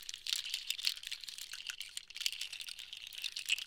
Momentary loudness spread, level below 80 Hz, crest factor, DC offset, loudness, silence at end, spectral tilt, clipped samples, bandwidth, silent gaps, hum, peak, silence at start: 9 LU; -76 dBFS; 28 dB; under 0.1%; -39 LUFS; 0 s; 4.5 dB/octave; under 0.1%; 18 kHz; none; none; -14 dBFS; 0 s